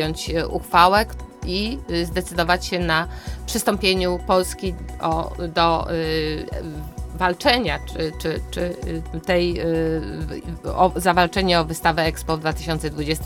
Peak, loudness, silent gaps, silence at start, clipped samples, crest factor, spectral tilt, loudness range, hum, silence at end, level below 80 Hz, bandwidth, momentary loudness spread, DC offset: 0 dBFS; -21 LUFS; none; 0 s; under 0.1%; 20 dB; -4.5 dB/octave; 3 LU; none; 0 s; -34 dBFS; 18.5 kHz; 11 LU; under 0.1%